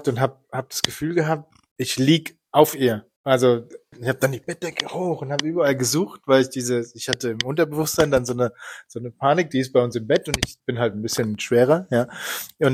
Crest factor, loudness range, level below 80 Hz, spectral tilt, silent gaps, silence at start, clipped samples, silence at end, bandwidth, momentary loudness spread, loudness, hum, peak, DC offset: 22 dB; 2 LU; -52 dBFS; -4.5 dB/octave; 1.71-1.76 s, 3.16-3.24 s; 0 s; under 0.1%; 0 s; 16 kHz; 10 LU; -22 LUFS; none; 0 dBFS; under 0.1%